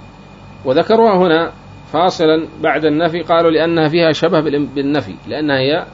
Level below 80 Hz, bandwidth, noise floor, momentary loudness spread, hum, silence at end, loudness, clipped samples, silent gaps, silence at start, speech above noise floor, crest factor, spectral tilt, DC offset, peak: -48 dBFS; 7.8 kHz; -37 dBFS; 9 LU; none; 0 s; -14 LUFS; under 0.1%; none; 0 s; 23 dB; 12 dB; -6.5 dB/octave; under 0.1%; -2 dBFS